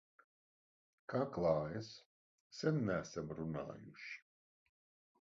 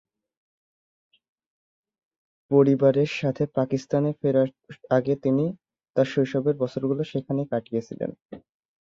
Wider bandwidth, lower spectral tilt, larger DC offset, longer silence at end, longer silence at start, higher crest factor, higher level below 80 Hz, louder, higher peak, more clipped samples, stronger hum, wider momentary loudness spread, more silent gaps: about the same, 7.4 kHz vs 7.4 kHz; second, -6.5 dB/octave vs -8 dB/octave; neither; first, 1 s vs 0.45 s; second, 1.1 s vs 2.5 s; about the same, 22 dB vs 20 dB; about the same, -68 dBFS vs -66 dBFS; second, -41 LUFS vs -24 LUFS; second, -22 dBFS vs -6 dBFS; neither; neither; first, 17 LU vs 10 LU; first, 2.06-2.50 s vs 5.90-5.94 s, 8.22-8.29 s